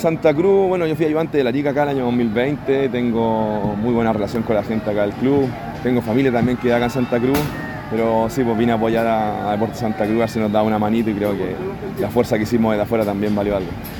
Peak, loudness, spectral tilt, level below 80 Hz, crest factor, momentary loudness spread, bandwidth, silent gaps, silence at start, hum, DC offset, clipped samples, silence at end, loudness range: -2 dBFS; -19 LUFS; -7 dB/octave; -42 dBFS; 16 dB; 4 LU; 19 kHz; none; 0 s; none; under 0.1%; under 0.1%; 0 s; 1 LU